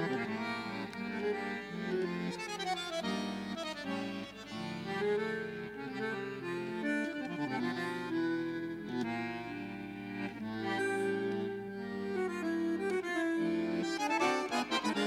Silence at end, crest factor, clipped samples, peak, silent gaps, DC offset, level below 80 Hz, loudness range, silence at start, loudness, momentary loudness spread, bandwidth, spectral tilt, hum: 0 s; 18 dB; under 0.1%; -18 dBFS; none; under 0.1%; -70 dBFS; 4 LU; 0 s; -36 LUFS; 8 LU; 15.5 kHz; -5 dB/octave; none